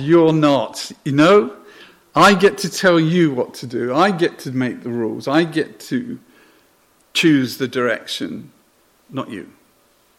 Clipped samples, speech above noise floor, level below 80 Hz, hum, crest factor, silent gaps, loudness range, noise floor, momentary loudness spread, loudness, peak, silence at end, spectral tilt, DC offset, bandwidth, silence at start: under 0.1%; 40 dB; -58 dBFS; none; 16 dB; none; 6 LU; -57 dBFS; 16 LU; -17 LUFS; -2 dBFS; 0.75 s; -5.5 dB/octave; under 0.1%; 16 kHz; 0 s